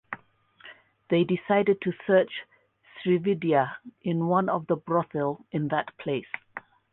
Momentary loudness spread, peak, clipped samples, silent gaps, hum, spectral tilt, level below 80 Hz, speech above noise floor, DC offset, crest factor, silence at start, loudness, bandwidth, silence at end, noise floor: 14 LU; -10 dBFS; under 0.1%; none; none; -10.5 dB/octave; -70 dBFS; 32 dB; under 0.1%; 18 dB; 0.1 s; -27 LUFS; 4.1 kHz; 0.35 s; -58 dBFS